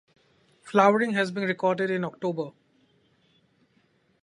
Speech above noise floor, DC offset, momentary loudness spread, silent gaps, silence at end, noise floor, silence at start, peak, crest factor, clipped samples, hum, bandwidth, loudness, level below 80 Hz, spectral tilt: 42 dB; under 0.1%; 10 LU; none; 1.75 s; -66 dBFS; 0.65 s; -4 dBFS; 24 dB; under 0.1%; none; 11 kHz; -25 LUFS; -78 dBFS; -6 dB/octave